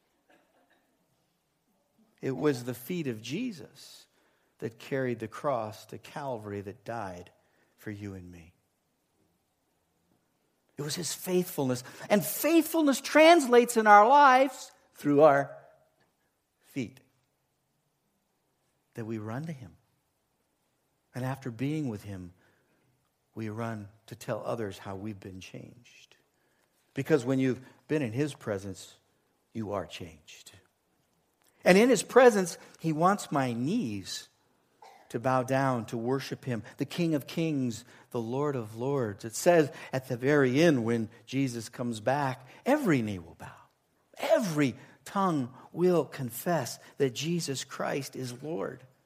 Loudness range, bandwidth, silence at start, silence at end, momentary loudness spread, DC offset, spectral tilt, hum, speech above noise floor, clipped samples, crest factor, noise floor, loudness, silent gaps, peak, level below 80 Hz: 19 LU; 15.5 kHz; 2.25 s; 0.3 s; 20 LU; under 0.1%; -5.5 dB/octave; none; 48 dB; under 0.1%; 24 dB; -76 dBFS; -28 LUFS; none; -6 dBFS; -74 dBFS